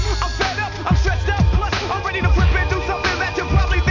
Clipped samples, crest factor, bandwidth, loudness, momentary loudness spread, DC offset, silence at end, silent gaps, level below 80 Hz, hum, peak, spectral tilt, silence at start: under 0.1%; 14 dB; 7.4 kHz; -19 LUFS; 4 LU; under 0.1%; 0 s; none; -20 dBFS; none; -4 dBFS; -5.5 dB/octave; 0 s